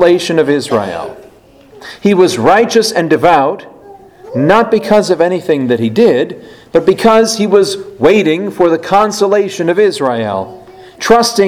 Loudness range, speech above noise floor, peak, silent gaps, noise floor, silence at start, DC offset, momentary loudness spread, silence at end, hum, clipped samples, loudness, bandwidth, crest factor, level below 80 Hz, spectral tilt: 2 LU; 30 dB; 0 dBFS; none; -41 dBFS; 0 s; under 0.1%; 12 LU; 0 s; none; 0.5%; -11 LUFS; 16 kHz; 12 dB; -46 dBFS; -5 dB/octave